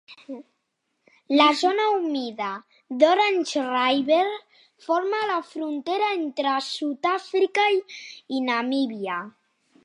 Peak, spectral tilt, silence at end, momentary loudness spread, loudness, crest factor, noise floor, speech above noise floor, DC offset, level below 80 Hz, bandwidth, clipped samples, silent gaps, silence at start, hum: -4 dBFS; -3 dB/octave; 0.55 s; 19 LU; -23 LUFS; 20 dB; -76 dBFS; 53 dB; under 0.1%; -80 dBFS; 11.5 kHz; under 0.1%; none; 0.1 s; none